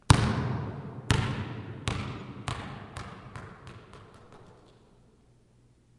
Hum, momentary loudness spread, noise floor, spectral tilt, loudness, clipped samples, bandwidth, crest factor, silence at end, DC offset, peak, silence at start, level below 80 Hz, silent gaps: none; 23 LU; -62 dBFS; -5 dB/octave; -32 LUFS; under 0.1%; 11.5 kHz; 32 dB; 1.45 s; under 0.1%; 0 dBFS; 0.1 s; -46 dBFS; none